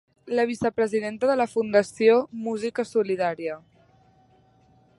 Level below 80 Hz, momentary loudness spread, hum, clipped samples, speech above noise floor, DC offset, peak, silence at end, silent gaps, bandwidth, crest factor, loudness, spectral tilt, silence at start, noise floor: -66 dBFS; 10 LU; none; under 0.1%; 36 dB; under 0.1%; -6 dBFS; 1.4 s; none; 11.5 kHz; 18 dB; -24 LUFS; -5.5 dB/octave; 0.25 s; -59 dBFS